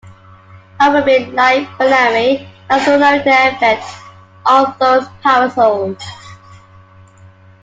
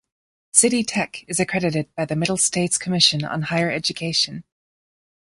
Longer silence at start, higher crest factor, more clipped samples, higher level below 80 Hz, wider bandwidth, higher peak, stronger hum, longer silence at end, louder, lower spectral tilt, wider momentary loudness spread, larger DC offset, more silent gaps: second, 0.05 s vs 0.55 s; second, 14 dB vs 22 dB; neither; about the same, -56 dBFS vs -58 dBFS; second, 9 kHz vs 11.5 kHz; about the same, 0 dBFS vs 0 dBFS; neither; first, 1.25 s vs 0.95 s; first, -12 LUFS vs -20 LUFS; first, -4.5 dB/octave vs -3 dB/octave; about the same, 10 LU vs 9 LU; neither; neither